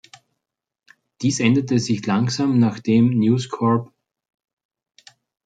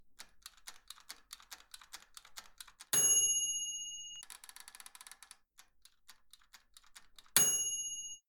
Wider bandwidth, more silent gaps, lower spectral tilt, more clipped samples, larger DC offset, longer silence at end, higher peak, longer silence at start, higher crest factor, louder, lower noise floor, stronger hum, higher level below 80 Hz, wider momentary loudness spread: second, 9.2 kHz vs 19 kHz; neither; first, -6 dB/octave vs 1.5 dB/octave; neither; neither; first, 1.6 s vs 0.1 s; first, -4 dBFS vs -8 dBFS; first, 1.2 s vs 0.05 s; second, 18 dB vs 32 dB; first, -19 LUFS vs -31 LUFS; first, -82 dBFS vs -65 dBFS; neither; first, -62 dBFS vs -74 dBFS; second, 5 LU vs 26 LU